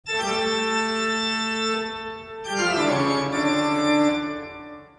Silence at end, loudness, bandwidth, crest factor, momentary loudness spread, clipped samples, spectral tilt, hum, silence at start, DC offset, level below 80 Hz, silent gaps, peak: 0.15 s; -23 LUFS; 10.5 kHz; 14 dB; 13 LU; under 0.1%; -3.5 dB/octave; none; 0.05 s; under 0.1%; -58 dBFS; none; -10 dBFS